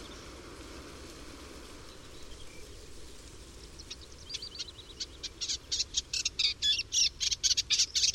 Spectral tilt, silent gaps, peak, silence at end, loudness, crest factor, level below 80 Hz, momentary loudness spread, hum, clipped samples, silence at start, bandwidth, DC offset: 0.5 dB/octave; none; -12 dBFS; 0 s; -30 LUFS; 22 dB; -52 dBFS; 23 LU; none; under 0.1%; 0 s; 16 kHz; under 0.1%